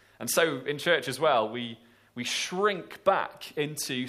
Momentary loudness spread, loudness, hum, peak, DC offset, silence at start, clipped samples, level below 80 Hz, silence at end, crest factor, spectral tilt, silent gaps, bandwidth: 10 LU; -28 LUFS; none; -10 dBFS; under 0.1%; 0.2 s; under 0.1%; -74 dBFS; 0 s; 20 dB; -3 dB/octave; none; 15.5 kHz